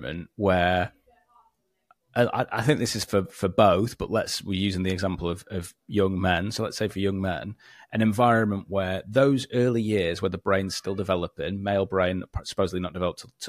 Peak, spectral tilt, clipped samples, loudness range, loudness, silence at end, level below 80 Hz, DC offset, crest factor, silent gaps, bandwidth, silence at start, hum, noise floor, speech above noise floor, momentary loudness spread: -6 dBFS; -5.5 dB/octave; under 0.1%; 3 LU; -26 LUFS; 0 s; -50 dBFS; under 0.1%; 20 dB; none; 15.5 kHz; 0 s; none; -67 dBFS; 42 dB; 10 LU